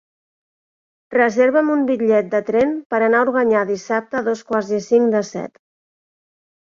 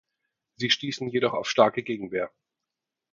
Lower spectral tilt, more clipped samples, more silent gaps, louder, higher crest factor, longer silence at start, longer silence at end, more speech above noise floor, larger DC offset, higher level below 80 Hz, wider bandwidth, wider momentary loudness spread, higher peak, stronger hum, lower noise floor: first, -6 dB/octave vs -4 dB/octave; neither; first, 2.86-2.90 s vs none; first, -18 LUFS vs -26 LUFS; second, 16 dB vs 24 dB; first, 1.1 s vs 0.6 s; first, 1.2 s vs 0.85 s; first, over 73 dB vs 61 dB; neither; first, -62 dBFS vs -70 dBFS; about the same, 7.6 kHz vs 7.6 kHz; second, 7 LU vs 10 LU; about the same, -2 dBFS vs -4 dBFS; neither; about the same, under -90 dBFS vs -87 dBFS